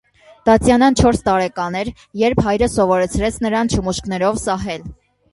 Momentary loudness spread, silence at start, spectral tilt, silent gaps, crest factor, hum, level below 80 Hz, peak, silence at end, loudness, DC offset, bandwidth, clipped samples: 10 LU; 0.45 s; -5.5 dB/octave; none; 16 dB; none; -34 dBFS; 0 dBFS; 0.4 s; -17 LUFS; under 0.1%; 11.5 kHz; under 0.1%